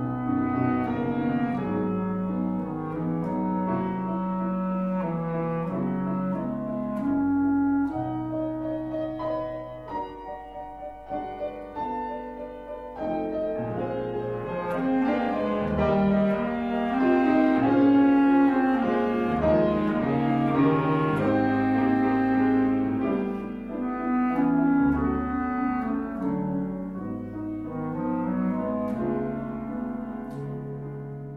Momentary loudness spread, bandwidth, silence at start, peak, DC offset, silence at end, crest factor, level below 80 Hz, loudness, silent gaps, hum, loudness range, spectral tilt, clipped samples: 12 LU; 5 kHz; 0 s; -10 dBFS; under 0.1%; 0 s; 16 dB; -48 dBFS; -26 LUFS; none; none; 10 LU; -9.5 dB/octave; under 0.1%